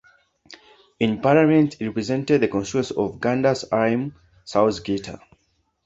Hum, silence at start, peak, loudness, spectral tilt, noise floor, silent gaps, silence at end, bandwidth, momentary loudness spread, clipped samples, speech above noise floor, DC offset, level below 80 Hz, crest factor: none; 0.5 s; -2 dBFS; -21 LUFS; -6.5 dB/octave; -68 dBFS; none; 0.7 s; 8 kHz; 10 LU; under 0.1%; 48 dB; under 0.1%; -54 dBFS; 20 dB